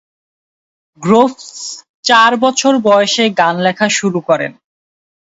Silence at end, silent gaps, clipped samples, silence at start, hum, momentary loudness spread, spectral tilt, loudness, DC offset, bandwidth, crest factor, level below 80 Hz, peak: 0.7 s; 1.89-2.03 s; under 0.1%; 1 s; none; 15 LU; -3.5 dB/octave; -12 LUFS; under 0.1%; 8 kHz; 14 dB; -60 dBFS; 0 dBFS